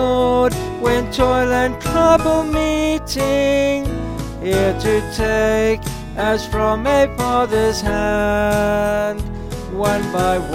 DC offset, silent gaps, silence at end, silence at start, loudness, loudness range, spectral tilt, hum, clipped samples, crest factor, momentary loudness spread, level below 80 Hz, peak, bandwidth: 0.1%; none; 0 s; 0 s; -17 LUFS; 2 LU; -5.5 dB/octave; none; under 0.1%; 16 dB; 8 LU; -30 dBFS; 0 dBFS; 17 kHz